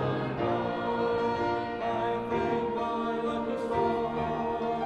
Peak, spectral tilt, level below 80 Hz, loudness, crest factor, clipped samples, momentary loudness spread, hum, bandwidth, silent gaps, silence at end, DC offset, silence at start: -14 dBFS; -7.5 dB/octave; -56 dBFS; -30 LUFS; 14 dB; under 0.1%; 3 LU; none; 9.4 kHz; none; 0 s; under 0.1%; 0 s